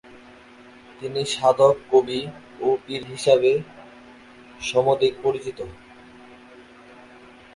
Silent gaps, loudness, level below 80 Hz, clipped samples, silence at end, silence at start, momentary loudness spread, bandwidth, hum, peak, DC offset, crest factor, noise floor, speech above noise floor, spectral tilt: none; -22 LUFS; -58 dBFS; under 0.1%; 1.8 s; 0.15 s; 18 LU; 11.5 kHz; none; -4 dBFS; under 0.1%; 20 dB; -47 dBFS; 26 dB; -4.5 dB/octave